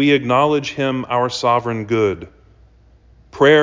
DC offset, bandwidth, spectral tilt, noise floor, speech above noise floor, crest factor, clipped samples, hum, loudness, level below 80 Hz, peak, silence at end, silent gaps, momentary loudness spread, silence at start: under 0.1%; 7.6 kHz; -5.5 dB/octave; -49 dBFS; 32 dB; 16 dB; under 0.1%; none; -17 LUFS; -50 dBFS; -2 dBFS; 0 s; none; 6 LU; 0 s